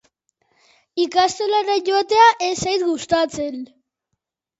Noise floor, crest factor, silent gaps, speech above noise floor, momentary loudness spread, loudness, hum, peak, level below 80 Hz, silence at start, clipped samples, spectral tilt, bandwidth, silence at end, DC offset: -78 dBFS; 20 dB; none; 60 dB; 15 LU; -18 LUFS; none; 0 dBFS; -56 dBFS; 0.95 s; under 0.1%; -3 dB/octave; 8.2 kHz; 0.95 s; under 0.1%